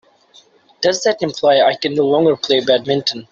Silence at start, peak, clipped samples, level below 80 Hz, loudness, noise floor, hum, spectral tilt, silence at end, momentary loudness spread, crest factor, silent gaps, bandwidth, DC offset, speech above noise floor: 0.8 s; -2 dBFS; under 0.1%; -60 dBFS; -15 LUFS; -50 dBFS; none; -4 dB/octave; 0.1 s; 5 LU; 14 dB; none; 7.8 kHz; under 0.1%; 35 dB